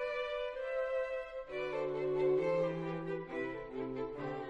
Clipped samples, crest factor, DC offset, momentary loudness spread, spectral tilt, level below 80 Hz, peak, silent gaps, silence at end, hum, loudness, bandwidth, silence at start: under 0.1%; 14 dB; under 0.1%; 9 LU; -7.5 dB/octave; -62 dBFS; -24 dBFS; none; 0 s; none; -37 LUFS; 8 kHz; 0 s